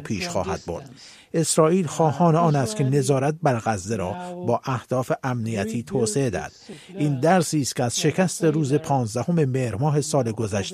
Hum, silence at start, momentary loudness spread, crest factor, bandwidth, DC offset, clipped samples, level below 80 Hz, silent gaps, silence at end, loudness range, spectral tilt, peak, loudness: none; 0 s; 10 LU; 18 dB; 15 kHz; under 0.1%; under 0.1%; -56 dBFS; none; 0 s; 4 LU; -5.5 dB/octave; -4 dBFS; -23 LUFS